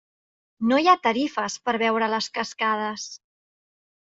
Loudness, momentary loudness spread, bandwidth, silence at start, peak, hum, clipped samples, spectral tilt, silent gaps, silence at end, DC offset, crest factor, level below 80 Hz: -23 LUFS; 10 LU; 7.8 kHz; 0.6 s; -4 dBFS; none; under 0.1%; -3.5 dB/octave; none; 1 s; under 0.1%; 22 dB; -70 dBFS